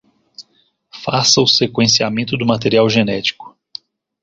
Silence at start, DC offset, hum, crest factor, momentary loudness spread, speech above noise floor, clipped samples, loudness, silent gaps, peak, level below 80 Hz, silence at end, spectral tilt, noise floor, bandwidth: 0.4 s; under 0.1%; none; 16 dB; 22 LU; 45 dB; under 0.1%; -14 LUFS; none; 0 dBFS; -52 dBFS; 0.75 s; -3.5 dB/octave; -60 dBFS; 7.8 kHz